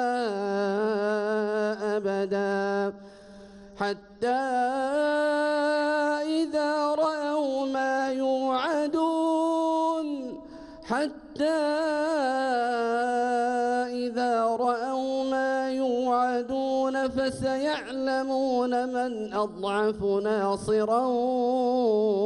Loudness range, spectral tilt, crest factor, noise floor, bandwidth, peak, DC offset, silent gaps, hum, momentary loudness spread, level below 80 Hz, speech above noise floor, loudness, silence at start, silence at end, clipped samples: 2 LU; -5 dB/octave; 12 dB; -47 dBFS; 11.5 kHz; -14 dBFS; under 0.1%; none; none; 5 LU; -62 dBFS; 22 dB; -27 LUFS; 0 s; 0 s; under 0.1%